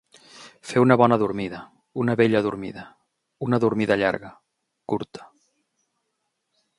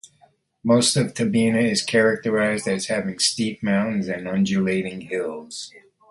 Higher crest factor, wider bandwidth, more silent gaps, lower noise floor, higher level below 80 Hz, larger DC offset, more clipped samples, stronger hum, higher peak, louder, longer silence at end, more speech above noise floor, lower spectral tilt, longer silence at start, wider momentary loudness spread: first, 24 dB vs 18 dB; about the same, 11.5 kHz vs 11.5 kHz; neither; first, -77 dBFS vs -59 dBFS; about the same, -60 dBFS vs -60 dBFS; neither; neither; neither; first, 0 dBFS vs -4 dBFS; about the same, -22 LUFS vs -21 LUFS; first, 1.55 s vs 0.3 s; first, 55 dB vs 38 dB; first, -7 dB/octave vs -4 dB/octave; second, 0.35 s vs 0.65 s; first, 22 LU vs 11 LU